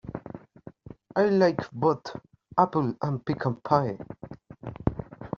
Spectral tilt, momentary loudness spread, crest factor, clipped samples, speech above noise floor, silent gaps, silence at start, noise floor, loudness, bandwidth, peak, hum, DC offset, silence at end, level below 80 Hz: -6.5 dB/octave; 21 LU; 24 dB; under 0.1%; 24 dB; none; 0.05 s; -49 dBFS; -27 LUFS; 7.2 kHz; -4 dBFS; none; under 0.1%; 0.1 s; -52 dBFS